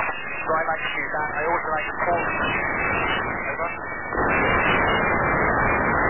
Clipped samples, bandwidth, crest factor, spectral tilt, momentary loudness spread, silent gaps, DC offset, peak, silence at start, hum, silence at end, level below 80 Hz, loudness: under 0.1%; 3.2 kHz; 14 dB; -8.5 dB/octave; 7 LU; none; 0.8%; -8 dBFS; 0 s; none; 0 s; -40 dBFS; -22 LUFS